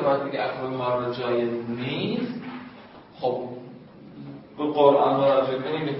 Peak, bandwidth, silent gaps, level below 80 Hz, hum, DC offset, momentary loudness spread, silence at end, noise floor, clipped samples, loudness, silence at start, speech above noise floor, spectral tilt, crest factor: -4 dBFS; 5.8 kHz; none; -66 dBFS; none; under 0.1%; 22 LU; 0 s; -46 dBFS; under 0.1%; -24 LUFS; 0 s; 22 dB; -10.5 dB/octave; 22 dB